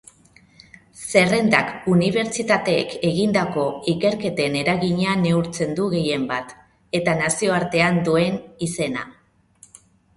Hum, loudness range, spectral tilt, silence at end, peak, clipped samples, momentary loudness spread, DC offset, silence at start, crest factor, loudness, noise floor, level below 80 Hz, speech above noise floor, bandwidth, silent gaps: none; 2 LU; -5 dB/octave; 1.05 s; 0 dBFS; under 0.1%; 9 LU; under 0.1%; 0.95 s; 20 dB; -20 LUFS; -53 dBFS; -54 dBFS; 33 dB; 11.5 kHz; none